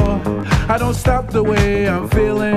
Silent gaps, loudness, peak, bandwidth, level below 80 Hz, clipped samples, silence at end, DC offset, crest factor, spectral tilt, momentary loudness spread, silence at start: none; -17 LUFS; 0 dBFS; 15 kHz; -24 dBFS; under 0.1%; 0 s; under 0.1%; 16 dB; -6.5 dB/octave; 3 LU; 0 s